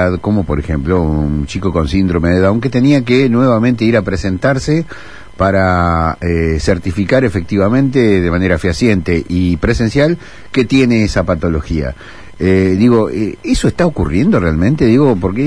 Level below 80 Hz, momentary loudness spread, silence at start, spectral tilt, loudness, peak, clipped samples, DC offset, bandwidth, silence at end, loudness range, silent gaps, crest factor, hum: -26 dBFS; 7 LU; 0 s; -7 dB/octave; -13 LUFS; 0 dBFS; under 0.1%; 2%; 10.5 kHz; 0 s; 2 LU; none; 12 dB; none